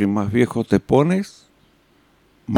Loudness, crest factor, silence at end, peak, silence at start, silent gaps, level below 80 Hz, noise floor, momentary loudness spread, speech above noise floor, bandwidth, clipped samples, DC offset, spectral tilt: -19 LUFS; 18 dB; 0 s; -2 dBFS; 0 s; none; -50 dBFS; -57 dBFS; 14 LU; 39 dB; 15 kHz; under 0.1%; under 0.1%; -7.5 dB/octave